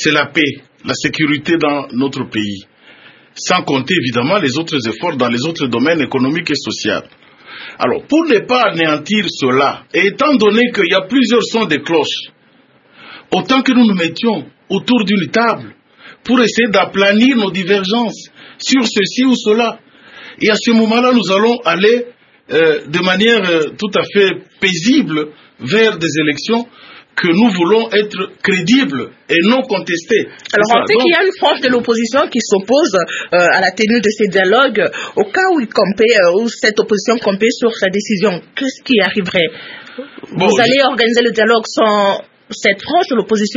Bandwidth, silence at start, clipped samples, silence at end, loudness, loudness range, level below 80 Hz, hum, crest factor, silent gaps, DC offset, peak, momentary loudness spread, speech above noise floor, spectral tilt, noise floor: 7.8 kHz; 0 s; under 0.1%; 0 s; -13 LUFS; 3 LU; -58 dBFS; none; 14 dB; none; under 0.1%; 0 dBFS; 8 LU; 37 dB; -4.5 dB/octave; -50 dBFS